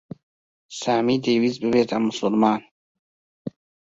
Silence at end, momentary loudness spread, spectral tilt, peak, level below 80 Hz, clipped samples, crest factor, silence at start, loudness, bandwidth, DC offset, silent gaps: 0.4 s; 18 LU; -5.5 dB/octave; -4 dBFS; -62 dBFS; under 0.1%; 20 dB; 0.7 s; -22 LUFS; 7.8 kHz; under 0.1%; 2.71-3.45 s